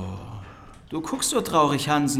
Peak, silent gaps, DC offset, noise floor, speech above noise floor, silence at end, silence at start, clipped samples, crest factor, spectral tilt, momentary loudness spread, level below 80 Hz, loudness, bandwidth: -6 dBFS; none; under 0.1%; -44 dBFS; 22 dB; 0 s; 0 s; under 0.1%; 18 dB; -4 dB/octave; 20 LU; -52 dBFS; -23 LUFS; 16.5 kHz